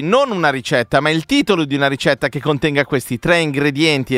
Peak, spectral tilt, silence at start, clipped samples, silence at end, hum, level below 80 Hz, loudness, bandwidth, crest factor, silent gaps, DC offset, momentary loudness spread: 0 dBFS; -5 dB/octave; 0 s; under 0.1%; 0 s; none; -46 dBFS; -16 LUFS; 16 kHz; 16 dB; none; under 0.1%; 4 LU